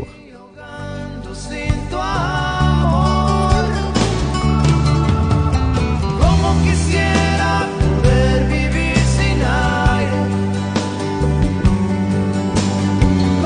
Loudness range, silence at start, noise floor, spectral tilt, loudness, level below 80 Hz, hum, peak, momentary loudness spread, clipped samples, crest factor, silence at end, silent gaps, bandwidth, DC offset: 2 LU; 0 s; -39 dBFS; -6 dB/octave; -16 LUFS; -24 dBFS; none; -2 dBFS; 7 LU; under 0.1%; 14 dB; 0 s; none; 10 kHz; under 0.1%